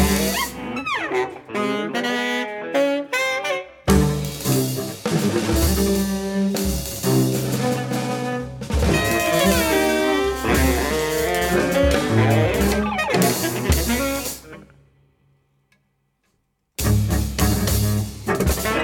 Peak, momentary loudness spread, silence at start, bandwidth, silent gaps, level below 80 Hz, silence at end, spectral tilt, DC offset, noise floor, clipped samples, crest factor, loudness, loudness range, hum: -2 dBFS; 7 LU; 0 s; 19 kHz; none; -30 dBFS; 0 s; -4.5 dB/octave; under 0.1%; -69 dBFS; under 0.1%; 20 dB; -21 LUFS; 6 LU; none